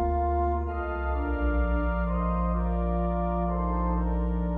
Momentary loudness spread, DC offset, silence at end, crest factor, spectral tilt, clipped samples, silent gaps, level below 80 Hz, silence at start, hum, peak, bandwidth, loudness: 3 LU; under 0.1%; 0 s; 10 dB; -11.5 dB/octave; under 0.1%; none; -30 dBFS; 0 s; none; -16 dBFS; 3.7 kHz; -28 LUFS